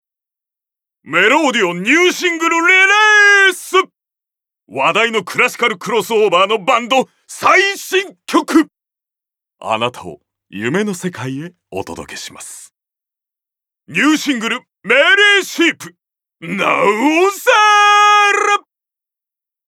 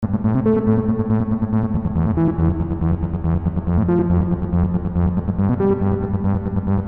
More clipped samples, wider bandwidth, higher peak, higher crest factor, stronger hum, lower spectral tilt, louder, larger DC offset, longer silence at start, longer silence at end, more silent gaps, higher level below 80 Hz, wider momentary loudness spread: neither; first, 17 kHz vs 3.5 kHz; first, 0 dBFS vs -6 dBFS; about the same, 14 dB vs 12 dB; neither; second, -2.5 dB/octave vs -13 dB/octave; first, -12 LUFS vs -19 LUFS; second, under 0.1% vs 0.7%; first, 1.05 s vs 0 s; first, 1.1 s vs 0 s; neither; second, -64 dBFS vs -30 dBFS; first, 19 LU vs 4 LU